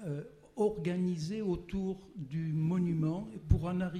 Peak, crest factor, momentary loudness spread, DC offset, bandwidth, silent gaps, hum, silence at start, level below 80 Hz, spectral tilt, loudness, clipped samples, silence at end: -14 dBFS; 20 dB; 10 LU; under 0.1%; 10.5 kHz; none; none; 0 s; -46 dBFS; -8.5 dB/octave; -34 LUFS; under 0.1%; 0 s